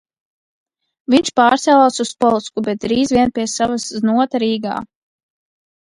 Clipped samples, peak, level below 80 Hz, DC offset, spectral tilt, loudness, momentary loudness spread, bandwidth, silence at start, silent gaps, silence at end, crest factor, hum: under 0.1%; 0 dBFS; -52 dBFS; under 0.1%; -4 dB/octave; -16 LUFS; 9 LU; 11.5 kHz; 1.1 s; none; 1 s; 16 dB; none